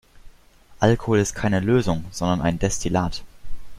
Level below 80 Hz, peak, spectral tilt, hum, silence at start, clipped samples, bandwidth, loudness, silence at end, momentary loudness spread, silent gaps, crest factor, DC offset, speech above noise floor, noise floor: -38 dBFS; -2 dBFS; -5.5 dB/octave; none; 0.15 s; under 0.1%; 15.5 kHz; -22 LUFS; 0 s; 6 LU; none; 20 dB; under 0.1%; 29 dB; -50 dBFS